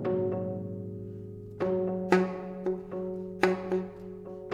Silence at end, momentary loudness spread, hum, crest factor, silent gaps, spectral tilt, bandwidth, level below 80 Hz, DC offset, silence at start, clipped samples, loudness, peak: 0 s; 16 LU; none; 24 dB; none; -7.5 dB/octave; 10.5 kHz; -60 dBFS; under 0.1%; 0 s; under 0.1%; -32 LUFS; -8 dBFS